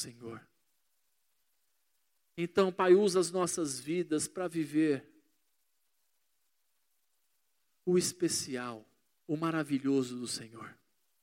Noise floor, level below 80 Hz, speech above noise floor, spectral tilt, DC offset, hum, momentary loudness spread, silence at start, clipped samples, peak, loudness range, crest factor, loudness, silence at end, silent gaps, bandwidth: -81 dBFS; -78 dBFS; 49 dB; -4.5 dB/octave; under 0.1%; none; 22 LU; 0 s; under 0.1%; -12 dBFS; 8 LU; 22 dB; -32 LUFS; 0.5 s; none; 16.5 kHz